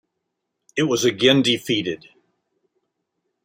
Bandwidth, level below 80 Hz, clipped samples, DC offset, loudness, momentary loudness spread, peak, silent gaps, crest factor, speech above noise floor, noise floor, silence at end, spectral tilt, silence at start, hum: 16 kHz; -66 dBFS; under 0.1%; under 0.1%; -19 LUFS; 14 LU; -2 dBFS; none; 22 dB; 59 dB; -78 dBFS; 1.5 s; -4 dB/octave; 0.75 s; none